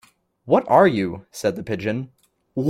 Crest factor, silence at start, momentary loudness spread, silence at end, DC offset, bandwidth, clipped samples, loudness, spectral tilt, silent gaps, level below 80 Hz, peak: 20 dB; 0.45 s; 15 LU; 0 s; under 0.1%; 15.5 kHz; under 0.1%; -20 LUFS; -6.5 dB/octave; none; -58 dBFS; -2 dBFS